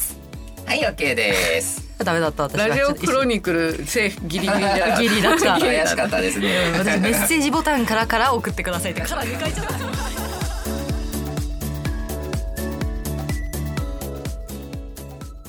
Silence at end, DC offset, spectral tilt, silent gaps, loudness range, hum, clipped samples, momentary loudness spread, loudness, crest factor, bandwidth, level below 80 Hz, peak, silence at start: 0 s; under 0.1%; -4 dB/octave; none; 9 LU; none; under 0.1%; 12 LU; -21 LUFS; 20 dB; over 20 kHz; -32 dBFS; -2 dBFS; 0 s